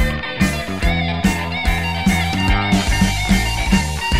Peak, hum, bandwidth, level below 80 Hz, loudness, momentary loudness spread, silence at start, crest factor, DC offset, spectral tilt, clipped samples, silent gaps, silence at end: -2 dBFS; none; 16 kHz; -22 dBFS; -18 LUFS; 4 LU; 0 s; 16 dB; 1%; -4.5 dB/octave; under 0.1%; none; 0 s